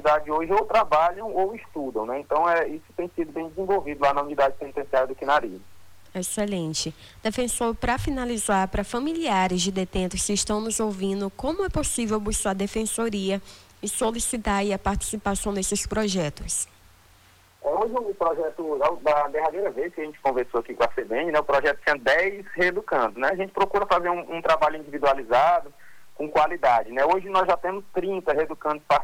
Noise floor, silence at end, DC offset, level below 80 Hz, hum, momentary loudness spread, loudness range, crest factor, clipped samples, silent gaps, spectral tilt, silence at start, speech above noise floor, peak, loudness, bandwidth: -56 dBFS; 0 s; under 0.1%; -44 dBFS; none; 8 LU; 4 LU; 16 dB; under 0.1%; none; -3.5 dB/octave; 0 s; 31 dB; -8 dBFS; -25 LUFS; 19 kHz